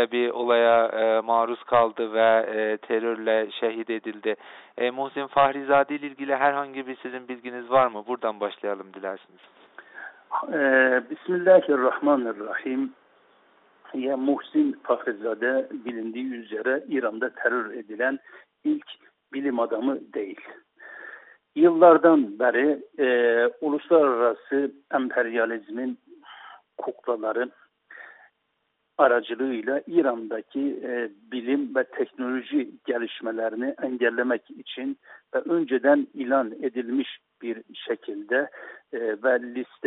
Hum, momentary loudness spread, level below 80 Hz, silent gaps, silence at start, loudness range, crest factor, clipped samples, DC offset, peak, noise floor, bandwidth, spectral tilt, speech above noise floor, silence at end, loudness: none; 15 LU; -74 dBFS; none; 0 s; 7 LU; 22 dB; under 0.1%; under 0.1%; -4 dBFS; -75 dBFS; 4.1 kHz; -2.5 dB/octave; 51 dB; 0 s; -24 LUFS